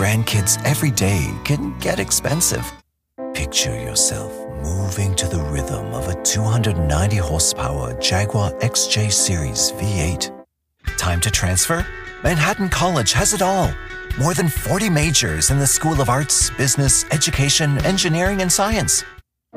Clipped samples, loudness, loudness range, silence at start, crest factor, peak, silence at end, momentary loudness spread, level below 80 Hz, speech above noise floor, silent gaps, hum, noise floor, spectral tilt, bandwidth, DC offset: under 0.1%; -18 LUFS; 4 LU; 0 s; 16 dB; -4 dBFS; 0.4 s; 10 LU; -32 dBFS; 27 dB; none; none; -46 dBFS; -3.5 dB/octave; 15.5 kHz; under 0.1%